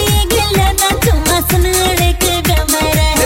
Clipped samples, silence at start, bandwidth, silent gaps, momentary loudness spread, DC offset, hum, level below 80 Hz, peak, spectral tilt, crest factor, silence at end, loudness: under 0.1%; 0 s; 17 kHz; none; 1 LU; under 0.1%; none; -18 dBFS; -2 dBFS; -3.5 dB/octave; 10 dB; 0 s; -12 LUFS